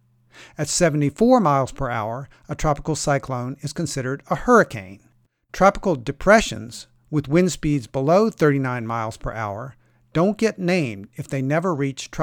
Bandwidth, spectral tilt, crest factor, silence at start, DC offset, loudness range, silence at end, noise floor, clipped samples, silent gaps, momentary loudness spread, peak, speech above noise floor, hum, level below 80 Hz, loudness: 17.5 kHz; -5.5 dB/octave; 20 dB; 0.35 s; under 0.1%; 4 LU; 0 s; -49 dBFS; under 0.1%; none; 13 LU; -2 dBFS; 28 dB; none; -42 dBFS; -21 LUFS